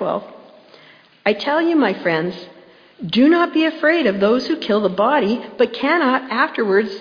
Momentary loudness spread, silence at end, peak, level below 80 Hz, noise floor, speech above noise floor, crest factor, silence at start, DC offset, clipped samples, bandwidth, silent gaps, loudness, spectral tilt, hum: 7 LU; 0 s; -2 dBFS; -64 dBFS; -47 dBFS; 30 dB; 16 dB; 0 s; under 0.1%; under 0.1%; 5.2 kHz; none; -17 LUFS; -6.5 dB/octave; none